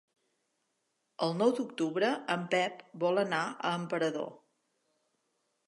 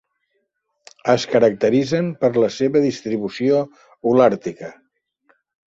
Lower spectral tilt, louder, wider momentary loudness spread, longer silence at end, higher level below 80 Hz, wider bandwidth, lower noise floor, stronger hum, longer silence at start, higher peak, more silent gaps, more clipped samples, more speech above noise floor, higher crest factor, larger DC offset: second, -5 dB/octave vs -6.5 dB/octave; second, -32 LUFS vs -18 LUFS; second, 6 LU vs 12 LU; first, 1.3 s vs 0.95 s; second, -86 dBFS vs -60 dBFS; first, 11.5 kHz vs 7.8 kHz; first, -80 dBFS vs -71 dBFS; neither; first, 1.2 s vs 1.05 s; second, -14 dBFS vs -2 dBFS; neither; neither; second, 49 dB vs 54 dB; about the same, 20 dB vs 18 dB; neither